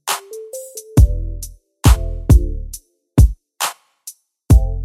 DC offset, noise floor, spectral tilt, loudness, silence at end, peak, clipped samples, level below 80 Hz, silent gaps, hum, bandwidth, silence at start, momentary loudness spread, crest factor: under 0.1%; -41 dBFS; -5.5 dB/octave; -17 LUFS; 0 s; 0 dBFS; under 0.1%; -18 dBFS; none; none; 15.5 kHz; 0.05 s; 20 LU; 16 dB